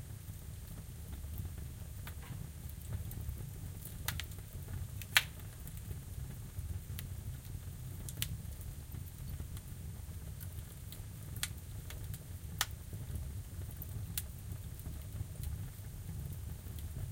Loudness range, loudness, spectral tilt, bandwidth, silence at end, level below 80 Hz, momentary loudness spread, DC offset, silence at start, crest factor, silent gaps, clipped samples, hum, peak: 7 LU; -43 LUFS; -3 dB/octave; 17 kHz; 0 s; -48 dBFS; 7 LU; under 0.1%; 0 s; 38 dB; none; under 0.1%; none; -6 dBFS